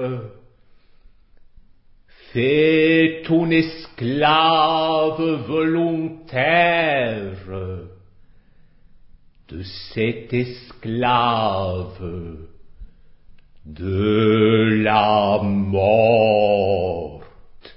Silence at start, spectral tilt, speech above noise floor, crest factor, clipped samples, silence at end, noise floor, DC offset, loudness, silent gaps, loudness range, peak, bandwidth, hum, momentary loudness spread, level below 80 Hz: 0 s; -11 dB/octave; 31 dB; 18 dB; under 0.1%; 0.2 s; -50 dBFS; under 0.1%; -18 LUFS; none; 9 LU; -2 dBFS; 5.8 kHz; none; 17 LU; -44 dBFS